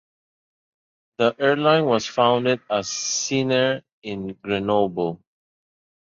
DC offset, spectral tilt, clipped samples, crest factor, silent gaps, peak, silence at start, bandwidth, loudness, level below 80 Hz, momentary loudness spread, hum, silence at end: under 0.1%; -4 dB/octave; under 0.1%; 18 dB; 3.92-4.02 s; -4 dBFS; 1.2 s; 7.8 kHz; -21 LUFS; -60 dBFS; 13 LU; none; 0.9 s